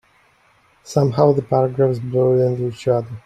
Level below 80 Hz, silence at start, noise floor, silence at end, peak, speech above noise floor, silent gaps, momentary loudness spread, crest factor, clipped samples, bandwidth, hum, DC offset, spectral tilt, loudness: -56 dBFS; 0.85 s; -56 dBFS; 0.05 s; -2 dBFS; 39 dB; none; 5 LU; 18 dB; under 0.1%; 9.8 kHz; none; under 0.1%; -8 dB/octave; -18 LUFS